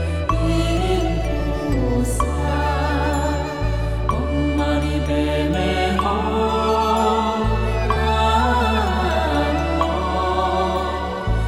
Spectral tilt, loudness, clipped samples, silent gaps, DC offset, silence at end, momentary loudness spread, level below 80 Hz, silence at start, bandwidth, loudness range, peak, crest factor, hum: -6 dB/octave; -20 LUFS; under 0.1%; none; under 0.1%; 0 s; 5 LU; -24 dBFS; 0 s; 14 kHz; 2 LU; -6 dBFS; 14 dB; none